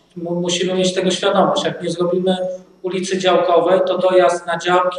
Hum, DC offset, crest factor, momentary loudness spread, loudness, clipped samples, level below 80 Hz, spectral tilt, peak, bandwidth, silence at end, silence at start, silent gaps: none; under 0.1%; 16 dB; 9 LU; -17 LUFS; under 0.1%; -62 dBFS; -4.5 dB/octave; 0 dBFS; 10.5 kHz; 0 s; 0.15 s; none